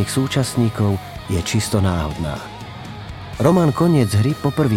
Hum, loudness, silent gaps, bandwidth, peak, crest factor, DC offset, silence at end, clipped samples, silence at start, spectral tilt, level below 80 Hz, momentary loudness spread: none; -19 LUFS; none; 16.5 kHz; -2 dBFS; 16 dB; under 0.1%; 0 s; under 0.1%; 0 s; -6 dB/octave; -38 dBFS; 17 LU